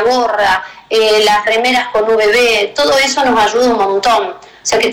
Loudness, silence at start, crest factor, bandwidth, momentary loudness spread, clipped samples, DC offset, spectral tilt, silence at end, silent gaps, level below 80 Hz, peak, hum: -11 LUFS; 0 s; 6 dB; 17.5 kHz; 6 LU; under 0.1%; under 0.1%; -1.5 dB/octave; 0 s; none; -44 dBFS; -6 dBFS; none